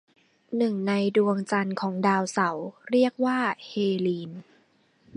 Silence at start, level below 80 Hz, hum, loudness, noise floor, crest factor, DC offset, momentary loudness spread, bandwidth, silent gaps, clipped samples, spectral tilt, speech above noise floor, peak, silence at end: 0.5 s; -74 dBFS; none; -26 LUFS; -64 dBFS; 18 dB; under 0.1%; 10 LU; 11 kHz; none; under 0.1%; -6 dB/octave; 39 dB; -8 dBFS; 0 s